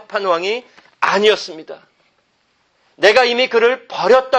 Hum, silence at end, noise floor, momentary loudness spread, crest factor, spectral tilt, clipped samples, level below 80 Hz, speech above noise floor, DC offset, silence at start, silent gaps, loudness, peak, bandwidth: none; 0 s; -62 dBFS; 14 LU; 16 dB; -3 dB/octave; under 0.1%; -62 dBFS; 47 dB; under 0.1%; 0.1 s; none; -15 LUFS; 0 dBFS; 8.8 kHz